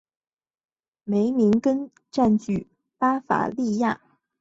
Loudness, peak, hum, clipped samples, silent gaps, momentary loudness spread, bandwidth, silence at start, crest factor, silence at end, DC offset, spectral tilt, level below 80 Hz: -23 LUFS; -6 dBFS; none; under 0.1%; none; 10 LU; 7.8 kHz; 1.05 s; 18 dB; 0.45 s; under 0.1%; -7.5 dB/octave; -58 dBFS